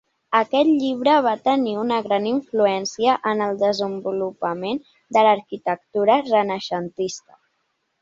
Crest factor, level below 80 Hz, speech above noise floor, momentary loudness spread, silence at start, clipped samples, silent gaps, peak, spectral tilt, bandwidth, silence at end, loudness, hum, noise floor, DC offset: 18 dB; -68 dBFS; 52 dB; 9 LU; 0.3 s; under 0.1%; none; -4 dBFS; -5 dB/octave; 7.8 kHz; 0.85 s; -21 LUFS; none; -72 dBFS; under 0.1%